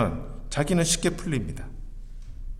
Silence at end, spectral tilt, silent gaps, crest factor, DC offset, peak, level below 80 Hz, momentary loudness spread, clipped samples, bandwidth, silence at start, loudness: 0 s; -4.5 dB/octave; none; 18 dB; under 0.1%; -10 dBFS; -36 dBFS; 23 LU; under 0.1%; 15 kHz; 0 s; -26 LUFS